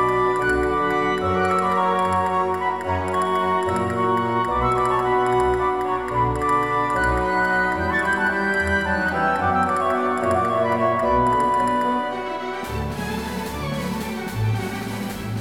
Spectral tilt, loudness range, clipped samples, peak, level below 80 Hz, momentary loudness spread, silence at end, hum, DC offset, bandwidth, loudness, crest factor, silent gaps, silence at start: -6 dB/octave; 3 LU; under 0.1%; -8 dBFS; -40 dBFS; 8 LU; 0 s; none; 0.3%; 17.5 kHz; -21 LUFS; 14 dB; none; 0 s